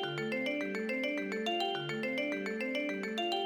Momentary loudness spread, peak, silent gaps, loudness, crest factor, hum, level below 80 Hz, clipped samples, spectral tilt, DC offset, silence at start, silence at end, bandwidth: 2 LU; -22 dBFS; none; -35 LUFS; 12 dB; none; -80 dBFS; under 0.1%; -4.5 dB/octave; under 0.1%; 0 s; 0 s; over 20 kHz